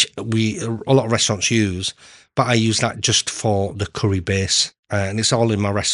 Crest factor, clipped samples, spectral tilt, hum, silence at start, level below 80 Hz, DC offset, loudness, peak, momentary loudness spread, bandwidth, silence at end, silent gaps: 18 dB; under 0.1%; -4 dB/octave; none; 0 s; -52 dBFS; under 0.1%; -19 LUFS; -2 dBFS; 7 LU; 11.5 kHz; 0 s; 4.79-4.83 s